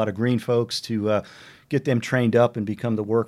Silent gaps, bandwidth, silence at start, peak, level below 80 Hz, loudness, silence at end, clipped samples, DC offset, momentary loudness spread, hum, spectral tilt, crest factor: none; 14.5 kHz; 0 s; -6 dBFS; -66 dBFS; -23 LUFS; 0 s; under 0.1%; under 0.1%; 7 LU; none; -6.5 dB/octave; 16 dB